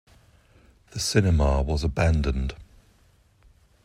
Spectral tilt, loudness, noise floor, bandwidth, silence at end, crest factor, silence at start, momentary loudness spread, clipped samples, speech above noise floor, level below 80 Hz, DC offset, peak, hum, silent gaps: -5.5 dB/octave; -24 LUFS; -60 dBFS; 15 kHz; 1.2 s; 20 dB; 0.95 s; 13 LU; under 0.1%; 37 dB; -32 dBFS; under 0.1%; -6 dBFS; none; none